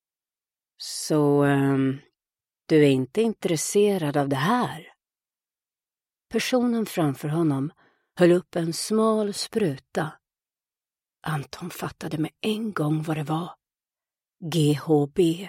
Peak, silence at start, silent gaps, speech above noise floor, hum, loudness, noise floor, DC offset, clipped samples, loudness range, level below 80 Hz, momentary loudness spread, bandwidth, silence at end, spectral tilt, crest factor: -8 dBFS; 0.8 s; none; over 67 dB; none; -24 LUFS; under -90 dBFS; under 0.1%; under 0.1%; 7 LU; -64 dBFS; 13 LU; 16.5 kHz; 0 s; -5.5 dB/octave; 18 dB